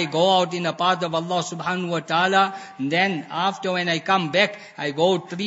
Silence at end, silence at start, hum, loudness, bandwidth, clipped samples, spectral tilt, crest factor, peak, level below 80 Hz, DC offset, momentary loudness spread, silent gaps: 0 s; 0 s; none; -22 LUFS; 8 kHz; under 0.1%; -4.5 dB/octave; 20 dB; -2 dBFS; -74 dBFS; under 0.1%; 7 LU; none